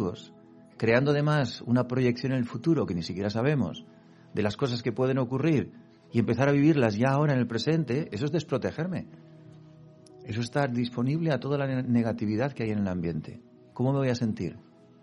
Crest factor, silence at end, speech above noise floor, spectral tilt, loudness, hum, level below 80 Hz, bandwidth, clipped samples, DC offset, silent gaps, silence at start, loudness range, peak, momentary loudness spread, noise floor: 18 dB; 0.4 s; 26 dB; -7.5 dB/octave; -28 LUFS; none; -60 dBFS; 10.5 kHz; under 0.1%; under 0.1%; none; 0 s; 5 LU; -8 dBFS; 10 LU; -53 dBFS